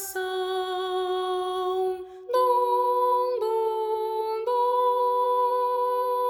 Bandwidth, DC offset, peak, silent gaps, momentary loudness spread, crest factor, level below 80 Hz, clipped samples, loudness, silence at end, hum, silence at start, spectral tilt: over 20 kHz; under 0.1%; -12 dBFS; none; 6 LU; 12 dB; -70 dBFS; under 0.1%; -25 LUFS; 0 s; none; 0 s; -2 dB/octave